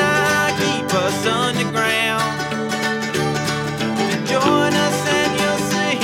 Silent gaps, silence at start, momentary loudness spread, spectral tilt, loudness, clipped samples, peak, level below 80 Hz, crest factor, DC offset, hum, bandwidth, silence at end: none; 0 s; 5 LU; -4 dB/octave; -18 LUFS; under 0.1%; -4 dBFS; -50 dBFS; 16 dB; under 0.1%; none; 18 kHz; 0 s